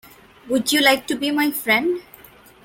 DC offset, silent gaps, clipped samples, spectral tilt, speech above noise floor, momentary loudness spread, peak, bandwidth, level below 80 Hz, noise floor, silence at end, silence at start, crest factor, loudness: under 0.1%; none; under 0.1%; -2 dB/octave; 27 dB; 9 LU; 0 dBFS; 17 kHz; -60 dBFS; -47 dBFS; 0.65 s; 0.45 s; 20 dB; -19 LUFS